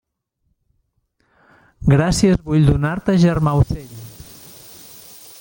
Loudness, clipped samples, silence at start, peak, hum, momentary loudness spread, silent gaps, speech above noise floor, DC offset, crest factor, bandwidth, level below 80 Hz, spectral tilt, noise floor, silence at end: -17 LUFS; under 0.1%; 1.8 s; -2 dBFS; none; 23 LU; none; 54 dB; under 0.1%; 18 dB; 17 kHz; -34 dBFS; -7 dB/octave; -70 dBFS; 1.3 s